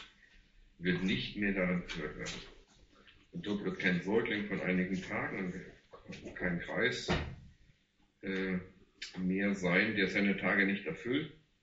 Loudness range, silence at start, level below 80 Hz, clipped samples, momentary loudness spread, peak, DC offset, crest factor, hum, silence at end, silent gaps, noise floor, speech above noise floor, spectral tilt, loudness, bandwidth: 5 LU; 0 s; -56 dBFS; under 0.1%; 17 LU; -16 dBFS; under 0.1%; 20 dB; none; 0.3 s; none; -72 dBFS; 37 dB; -4.5 dB/octave; -34 LUFS; 7.6 kHz